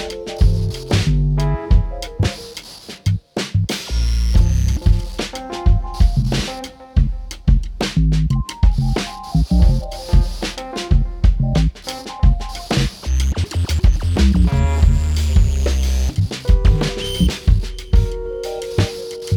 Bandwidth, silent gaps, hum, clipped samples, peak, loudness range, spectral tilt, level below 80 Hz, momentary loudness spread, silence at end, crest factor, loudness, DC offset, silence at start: 13.5 kHz; none; none; under 0.1%; -2 dBFS; 3 LU; -6 dB/octave; -18 dBFS; 9 LU; 0 s; 14 dB; -19 LUFS; under 0.1%; 0 s